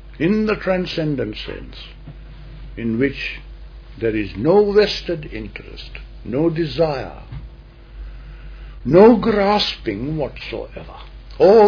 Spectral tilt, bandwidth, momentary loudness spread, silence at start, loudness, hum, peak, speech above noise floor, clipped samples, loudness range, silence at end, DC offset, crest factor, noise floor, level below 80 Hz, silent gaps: -7 dB/octave; 5.4 kHz; 25 LU; 0 s; -18 LUFS; none; 0 dBFS; 22 dB; under 0.1%; 7 LU; 0 s; under 0.1%; 18 dB; -40 dBFS; -36 dBFS; none